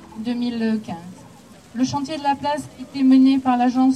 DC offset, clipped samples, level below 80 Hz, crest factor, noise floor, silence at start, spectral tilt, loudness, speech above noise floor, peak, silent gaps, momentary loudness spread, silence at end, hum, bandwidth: under 0.1%; under 0.1%; -60 dBFS; 14 dB; -45 dBFS; 0 s; -5.5 dB/octave; -20 LUFS; 26 dB; -6 dBFS; none; 19 LU; 0 s; none; 10.5 kHz